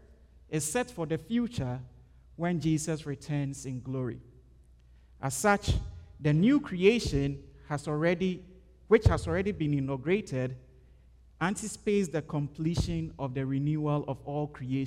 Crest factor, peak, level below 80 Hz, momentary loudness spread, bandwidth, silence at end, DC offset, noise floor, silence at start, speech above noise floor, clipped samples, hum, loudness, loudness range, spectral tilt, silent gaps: 22 dB; -8 dBFS; -46 dBFS; 12 LU; 16 kHz; 0 s; under 0.1%; -57 dBFS; 0.5 s; 28 dB; under 0.1%; none; -30 LUFS; 5 LU; -6 dB/octave; none